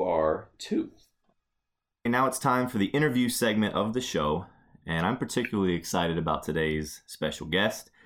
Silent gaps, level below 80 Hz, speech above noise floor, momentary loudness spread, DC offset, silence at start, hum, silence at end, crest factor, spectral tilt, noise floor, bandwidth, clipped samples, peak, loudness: none; -54 dBFS; 56 dB; 8 LU; under 0.1%; 0 s; none; 0.25 s; 18 dB; -5 dB/octave; -83 dBFS; 18.5 kHz; under 0.1%; -10 dBFS; -28 LUFS